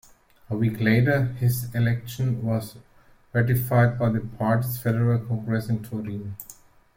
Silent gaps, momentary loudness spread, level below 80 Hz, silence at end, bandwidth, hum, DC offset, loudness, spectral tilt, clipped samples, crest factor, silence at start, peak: none; 13 LU; -52 dBFS; 0.45 s; 16.5 kHz; none; under 0.1%; -24 LUFS; -7.5 dB/octave; under 0.1%; 18 dB; 0.5 s; -6 dBFS